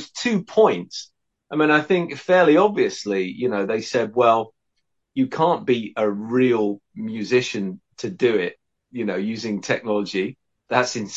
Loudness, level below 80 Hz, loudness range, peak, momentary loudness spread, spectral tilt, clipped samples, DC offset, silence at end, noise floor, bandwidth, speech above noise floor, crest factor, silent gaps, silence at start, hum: -21 LUFS; -68 dBFS; 5 LU; -2 dBFS; 13 LU; -5 dB/octave; under 0.1%; under 0.1%; 0 s; -76 dBFS; 8 kHz; 56 dB; 20 dB; none; 0 s; none